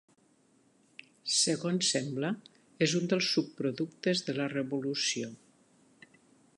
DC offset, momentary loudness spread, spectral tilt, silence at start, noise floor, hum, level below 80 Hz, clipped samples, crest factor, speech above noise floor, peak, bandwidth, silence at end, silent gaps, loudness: under 0.1%; 8 LU; -3.5 dB/octave; 1.25 s; -67 dBFS; none; -80 dBFS; under 0.1%; 20 dB; 36 dB; -14 dBFS; 11.5 kHz; 1.25 s; none; -31 LUFS